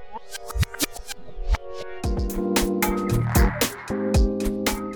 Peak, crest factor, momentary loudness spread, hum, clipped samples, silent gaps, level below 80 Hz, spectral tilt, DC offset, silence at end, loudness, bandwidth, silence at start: -6 dBFS; 18 dB; 15 LU; none; under 0.1%; none; -28 dBFS; -5 dB/octave; under 0.1%; 0 s; -24 LUFS; over 20 kHz; 0 s